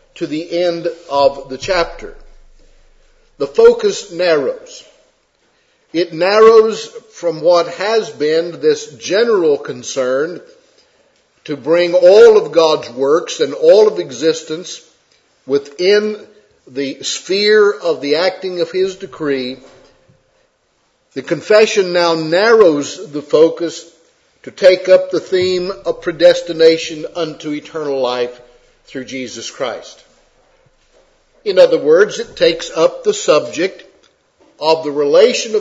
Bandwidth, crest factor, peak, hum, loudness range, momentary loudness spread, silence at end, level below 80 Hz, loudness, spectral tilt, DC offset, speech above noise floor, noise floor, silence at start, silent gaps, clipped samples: 8 kHz; 14 dB; 0 dBFS; none; 7 LU; 15 LU; 0 s; -50 dBFS; -14 LUFS; -3.5 dB/octave; under 0.1%; 47 dB; -60 dBFS; 0.15 s; none; 0.1%